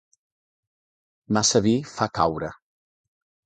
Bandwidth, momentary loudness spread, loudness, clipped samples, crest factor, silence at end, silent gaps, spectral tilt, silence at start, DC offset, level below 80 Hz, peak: 9.4 kHz; 12 LU; -23 LUFS; under 0.1%; 22 dB; 0.9 s; none; -4 dB/octave; 1.3 s; under 0.1%; -54 dBFS; -4 dBFS